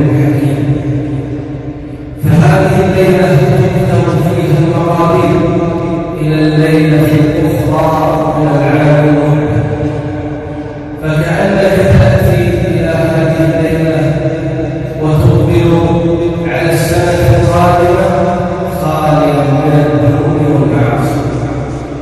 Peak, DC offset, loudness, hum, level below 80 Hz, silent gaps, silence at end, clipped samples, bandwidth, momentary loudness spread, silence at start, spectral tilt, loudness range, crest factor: 0 dBFS; under 0.1%; -10 LUFS; none; -28 dBFS; none; 0 s; 0.6%; 13.5 kHz; 9 LU; 0 s; -7.5 dB/octave; 2 LU; 10 dB